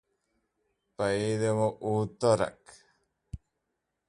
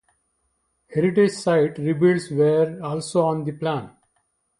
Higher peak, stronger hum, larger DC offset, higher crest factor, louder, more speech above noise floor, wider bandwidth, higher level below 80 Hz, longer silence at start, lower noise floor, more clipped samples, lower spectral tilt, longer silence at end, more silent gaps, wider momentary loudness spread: second, -10 dBFS vs -6 dBFS; neither; neither; about the same, 20 dB vs 16 dB; second, -29 LUFS vs -21 LUFS; about the same, 54 dB vs 51 dB; about the same, 11.5 kHz vs 11.5 kHz; about the same, -58 dBFS vs -62 dBFS; about the same, 1 s vs 0.9 s; first, -83 dBFS vs -71 dBFS; neither; about the same, -6 dB/octave vs -6.5 dB/octave; about the same, 0.75 s vs 0.7 s; neither; first, 21 LU vs 8 LU